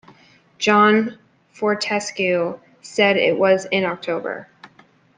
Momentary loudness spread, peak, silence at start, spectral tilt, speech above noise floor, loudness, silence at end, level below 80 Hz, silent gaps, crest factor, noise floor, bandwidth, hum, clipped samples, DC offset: 13 LU; -2 dBFS; 0.6 s; -4.5 dB/octave; 35 dB; -19 LUFS; 0.5 s; -68 dBFS; none; 18 dB; -53 dBFS; 9.6 kHz; none; under 0.1%; under 0.1%